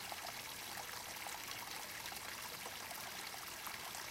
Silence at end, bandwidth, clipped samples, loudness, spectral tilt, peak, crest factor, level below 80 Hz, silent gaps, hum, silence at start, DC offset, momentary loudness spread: 0 s; 17 kHz; under 0.1%; -45 LUFS; -0.5 dB/octave; -28 dBFS; 20 dB; -72 dBFS; none; none; 0 s; under 0.1%; 1 LU